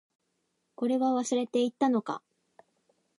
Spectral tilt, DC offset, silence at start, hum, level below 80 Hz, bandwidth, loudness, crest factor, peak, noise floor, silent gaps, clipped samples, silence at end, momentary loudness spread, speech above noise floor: -4.5 dB/octave; under 0.1%; 0.8 s; none; -86 dBFS; 11 kHz; -29 LUFS; 18 dB; -14 dBFS; -78 dBFS; none; under 0.1%; 1 s; 9 LU; 50 dB